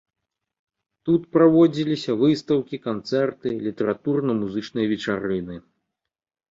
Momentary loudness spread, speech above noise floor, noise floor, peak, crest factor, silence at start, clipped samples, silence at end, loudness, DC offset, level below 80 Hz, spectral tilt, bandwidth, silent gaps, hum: 12 LU; 66 dB; -87 dBFS; -4 dBFS; 18 dB; 1.05 s; under 0.1%; 0.9 s; -22 LUFS; under 0.1%; -60 dBFS; -7.5 dB/octave; 7.6 kHz; none; none